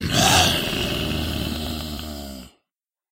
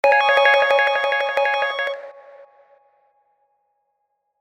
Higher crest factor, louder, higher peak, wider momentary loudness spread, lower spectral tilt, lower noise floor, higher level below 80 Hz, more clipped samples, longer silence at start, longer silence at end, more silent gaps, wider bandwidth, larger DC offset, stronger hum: about the same, 20 dB vs 18 dB; second, -21 LUFS vs -17 LUFS; about the same, -2 dBFS vs -4 dBFS; first, 19 LU vs 11 LU; first, -3 dB/octave vs -0.5 dB/octave; first, -86 dBFS vs -73 dBFS; first, -36 dBFS vs -76 dBFS; neither; about the same, 0 s vs 0.05 s; second, 0.65 s vs 2 s; neither; first, 16 kHz vs 11 kHz; neither; neither